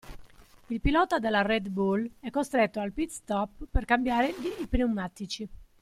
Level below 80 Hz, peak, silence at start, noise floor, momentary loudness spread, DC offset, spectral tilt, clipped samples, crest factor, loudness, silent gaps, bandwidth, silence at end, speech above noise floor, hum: -40 dBFS; -10 dBFS; 0.05 s; -52 dBFS; 10 LU; under 0.1%; -5.5 dB/octave; under 0.1%; 18 dB; -29 LUFS; none; 15 kHz; 0.2 s; 24 dB; none